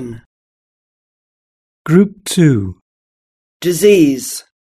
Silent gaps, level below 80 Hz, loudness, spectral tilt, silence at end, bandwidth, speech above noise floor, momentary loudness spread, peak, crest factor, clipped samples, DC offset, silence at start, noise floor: 0.26-1.85 s, 2.81-3.60 s; -50 dBFS; -13 LUFS; -6 dB/octave; 0.35 s; 14 kHz; over 78 dB; 18 LU; 0 dBFS; 16 dB; under 0.1%; under 0.1%; 0 s; under -90 dBFS